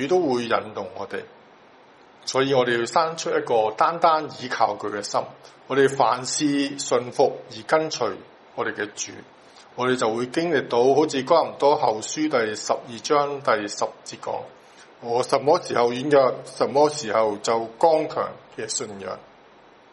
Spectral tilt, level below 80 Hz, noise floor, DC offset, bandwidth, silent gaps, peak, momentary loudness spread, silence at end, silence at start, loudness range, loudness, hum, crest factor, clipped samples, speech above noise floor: -4 dB/octave; -70 dBFS; -51 dBFS; under 0.1%; 11.5 kHz; none; -4 dBFS; 14 LU; 0.7 s; 0 s; 4 LU; -23 LUFS; none; 20 dB; under 0.1%; 29 dB